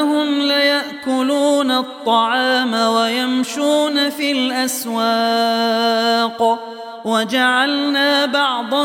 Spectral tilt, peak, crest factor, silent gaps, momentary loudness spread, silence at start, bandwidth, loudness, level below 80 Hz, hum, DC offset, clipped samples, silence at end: -2.5 dB/octave; -4 dBFS; 14 dB; none; 5 LU; 0 s; 17 kHz; -16 LUFS; -70 dBFS; none; under 0.1%; under 0.1%; 0 s